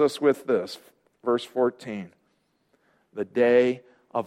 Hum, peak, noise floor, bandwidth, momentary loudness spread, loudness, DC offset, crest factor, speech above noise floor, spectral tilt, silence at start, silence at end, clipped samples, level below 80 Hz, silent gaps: none; -8 dBFS; -70 dBFS; 15 kHz; 18 LU; -25 LUFS; under 0.1%; 18 dB; 46 dB; -5.5 dB/octave; 0 s; 0 s; under 0.1%; -72 dBFS; none